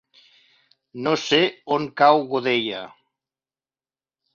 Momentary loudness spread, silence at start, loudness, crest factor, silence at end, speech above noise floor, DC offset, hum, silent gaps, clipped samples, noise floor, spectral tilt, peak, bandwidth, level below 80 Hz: 16 LU; 0.95 s; -20 LUFS; 22 dB; 1.45 s; over 69 dB; under 0.1%; none; none; under 0.1%; under -90 dBFS; -4.5 dB/octave; -2 dBFS; 7.6 kHz; -68 dBFS